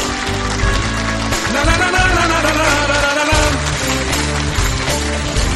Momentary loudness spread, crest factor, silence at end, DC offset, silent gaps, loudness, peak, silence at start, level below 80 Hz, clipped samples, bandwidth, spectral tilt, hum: 5 LU; 14 dB; 0 s; under 0.1%; none; -15 LUFS; -2 dBFS; 0 s; -22 dBFS; under 0.1%; 14 kHz; -3.5 dB/octave; none